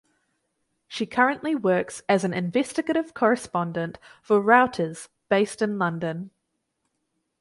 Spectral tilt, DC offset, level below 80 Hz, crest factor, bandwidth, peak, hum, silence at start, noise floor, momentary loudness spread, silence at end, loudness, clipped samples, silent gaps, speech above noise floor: -5.5 dB/octave; under 0.1%; -66 dBFS; 22 dB; 11.5 kHz; -4 dBFS; none; 0.9 s; -77 dBFS; 13 LU; 1.15 s; -24 LUFS; under 0.1%; none; 54 dB